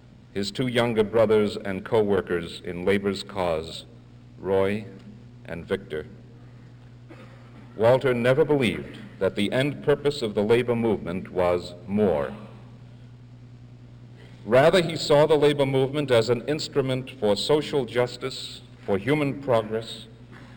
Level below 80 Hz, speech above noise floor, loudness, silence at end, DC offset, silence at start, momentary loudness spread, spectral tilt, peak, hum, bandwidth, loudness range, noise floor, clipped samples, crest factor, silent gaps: -52 dBFS; 23 dB; -24 LUFS; 0 s; under 0.1%; 0.35 s; 17 LU; -6 dB/octave; -6 dBFS; 60 Hz at -45 dBFS; over 20 kHz; 8 LU; -47 dBFS; under 0.1%; 18 dB; none